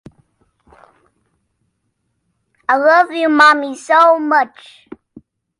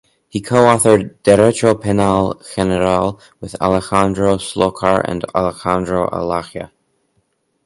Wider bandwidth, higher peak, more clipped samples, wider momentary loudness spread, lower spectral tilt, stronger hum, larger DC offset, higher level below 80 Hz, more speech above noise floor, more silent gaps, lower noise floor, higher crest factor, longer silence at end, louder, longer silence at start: about the same, 11.5 kHz vs 12 kHz; about the same, 0 dBFS vs 0 dBFS; neither; second, 8 LU vs 13 LU; second, -3 dB/octave vs -5.5 dB/octave; neither; neither; second, -64 dBFS vs -40 dBFS; first, 56 dB vs 49 dB; neither; first, -69 dBFS vs -65 dBFS; about the same, 16 dB vs 16 dB; about the same, 1.1 s vs 1 s; first, -12 LUFS vs -15 LUFS; first, 2.7 s vs 0.35 s